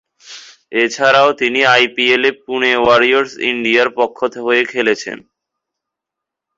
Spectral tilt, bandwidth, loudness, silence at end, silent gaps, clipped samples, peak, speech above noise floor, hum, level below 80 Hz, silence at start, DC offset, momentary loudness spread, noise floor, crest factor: -3 dB/octave; 7.8 kHz; -13 LUFS; 1.4 s; none; under 0.1%; 0 dBFS; 69 dB; none; -56 dBFS; 0.25 s; under 0.1%; 10 LU; -82 dBFS; 16 dB